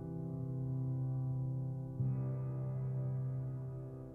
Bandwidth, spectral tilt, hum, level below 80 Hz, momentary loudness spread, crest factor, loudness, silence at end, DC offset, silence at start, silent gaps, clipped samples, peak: 2.1 kHz; -12.5 dB/octave; none; -60 dBFS; 5 LU; 12 dB; -40 LUFS; 0 s; under 0.1%; 0 s; none; under 0.1%; -28 dBFS